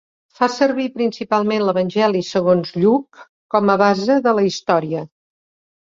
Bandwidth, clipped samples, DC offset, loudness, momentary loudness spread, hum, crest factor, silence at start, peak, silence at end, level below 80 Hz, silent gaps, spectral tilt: 7.6 kHz; under 0.1%; under 0.1%; -18 LUFS; 6 LU; none; 16 dB; 0.4 s; -2 dBFS; 0.9 s; -62 dBFS; 3.29-3.49 s; -6 dB/octave